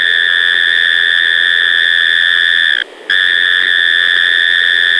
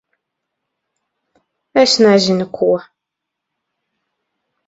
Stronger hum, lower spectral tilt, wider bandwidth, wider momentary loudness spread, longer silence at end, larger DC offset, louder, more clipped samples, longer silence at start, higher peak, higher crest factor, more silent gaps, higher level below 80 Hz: neither; second, 0.5 dB/octave vs -4.5 dB/octave; first, 11 kHz vs 8 kHz; second, 1 LU vs 8 LU; second, 0 s vs 1.85 s; neither; first, -9 LUFS vs -13 LUFS; neither; second, 0 s vs 1.75 s; about the same, 0 dBFS vs 0 dBFS; second, 10 dB vs 18 dB; neither; about the same, -56 dBFS vs -60 dBFS